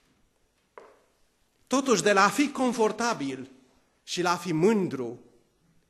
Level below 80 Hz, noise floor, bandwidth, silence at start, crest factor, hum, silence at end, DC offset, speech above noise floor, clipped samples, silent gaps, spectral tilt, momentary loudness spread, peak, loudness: -72 dBFS; -70 dBFS; 13 kHz; 1.7 s; 22 dB; none; 0.7 s; under 0.1%; 44 dB; under 0.1%; none; -4 dB/octave; 16 LU; -6 dBFS; -26 LUFS